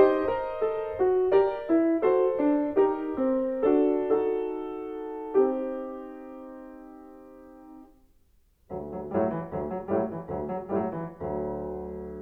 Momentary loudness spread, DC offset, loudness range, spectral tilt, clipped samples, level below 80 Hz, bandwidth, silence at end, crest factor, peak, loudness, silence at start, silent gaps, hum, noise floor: 17 LU; under 0.1%; 12 LU; -9.5 dB/octave; under 0.1%; -56 dBFS; 4.6 kHz; 0 s; 20 dB; -8 dBFS; -27 LUFS; 0 s; none; none; -63 dBFS